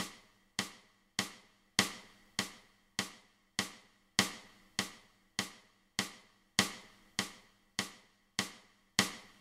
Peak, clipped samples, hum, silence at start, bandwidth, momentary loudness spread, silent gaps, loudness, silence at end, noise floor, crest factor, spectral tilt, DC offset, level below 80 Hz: -8 dBFS; under 0.1%; none; 0 s; 16 kHz; 12 LU; none; -38 LUFS; 0.15 s; -61 dBFS; 32 dB; -1.5 dB/octave; under 0.1%; -72 dBFS